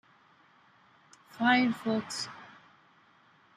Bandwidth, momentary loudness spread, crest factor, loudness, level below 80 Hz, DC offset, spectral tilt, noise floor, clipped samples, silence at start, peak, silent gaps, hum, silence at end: 13 kHz; 22 LU; 22 dB; -29 LUFS; -76 dBFS; under 0.1%; -4 dB/octave; -63 dBFS; under 0.1%; 1.35 s; -12 dBFS; none; none; 1.1 s